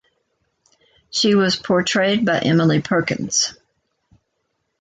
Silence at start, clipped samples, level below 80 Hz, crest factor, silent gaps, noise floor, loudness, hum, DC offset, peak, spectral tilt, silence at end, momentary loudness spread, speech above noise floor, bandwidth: 1.15 s; under 0.1%; -58 dBFS; 16 dB; none; -73 dBFS; -18 LUFS; none; under 0.1%; -4 dBFS; -4 dB/octave; 1.25 s; 4 LU; 55 dB; 9.4 kHz